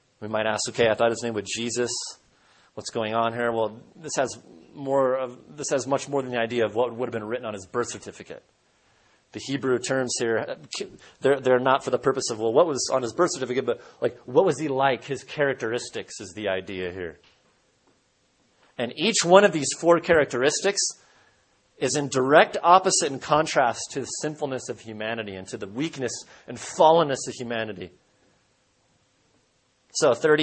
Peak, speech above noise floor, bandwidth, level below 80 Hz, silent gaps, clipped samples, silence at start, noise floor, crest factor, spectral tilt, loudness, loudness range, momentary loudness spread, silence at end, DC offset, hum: 0 dBFS; 43 dB; 8.8 kHz; -64 dBFS; none; under 0.1%; 0.2 s; -67 dBFS; 24 dB; -3.5 dB/octave; -24 LUFS; 8 LU; 17 LU; 0 s; under 0.1%; none